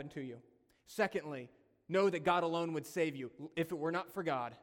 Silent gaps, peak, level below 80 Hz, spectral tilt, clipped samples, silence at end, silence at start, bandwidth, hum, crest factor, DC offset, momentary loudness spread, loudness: none; -18 dBFS; -76 dBFS; -5.5 dB/octave; under 0.1%; 0.05 s; 0 s; 18 kHz; none; 20 dB; under 0.1%; 15 LU; -37 LUFS